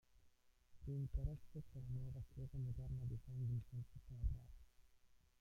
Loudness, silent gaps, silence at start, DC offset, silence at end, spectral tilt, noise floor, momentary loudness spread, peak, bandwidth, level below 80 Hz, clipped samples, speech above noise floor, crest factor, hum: -50 LUFS; none; 0.1 s; under 0.1%; 0.25 s; -9.5 dB/octave; -73 dBFS; 10 LU; -32 dBFS; 7 kHz; -54 dBFS; under 0.1%; 26 dB; 18 dB; none